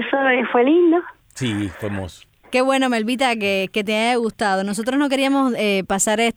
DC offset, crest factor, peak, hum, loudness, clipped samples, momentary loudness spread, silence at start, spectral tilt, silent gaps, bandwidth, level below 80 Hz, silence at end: under 0.1%; 16 dB; -4 dBFS; none; -19 LUFS; under 0.1%; 10 LU; 0 s; -4 dB/octave; none; 18.5 kHz; -54 dBFS; 0.05 s